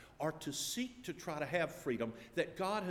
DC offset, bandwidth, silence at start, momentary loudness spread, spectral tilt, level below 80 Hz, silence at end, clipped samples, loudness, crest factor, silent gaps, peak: under 0.1%; 19.5 kHz; 0 s; 5 LU; -4 dB/octave; -68 dBFS; 0 s; under 0.1%; -40 LUFS; 20 dB; none; -20 dBFS